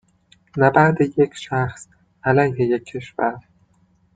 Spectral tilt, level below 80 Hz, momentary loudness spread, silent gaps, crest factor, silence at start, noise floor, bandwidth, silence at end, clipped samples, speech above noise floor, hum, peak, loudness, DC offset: -7.5 dB/octave; -56 dBFS; 13 LU; none; 18 dB; 0.55 s; -59 dBFS; 9.2 kHz; 0.75 s; under 0.1%; 41 dB; none; -2 dBFS; -19 LUFS; under 0.1%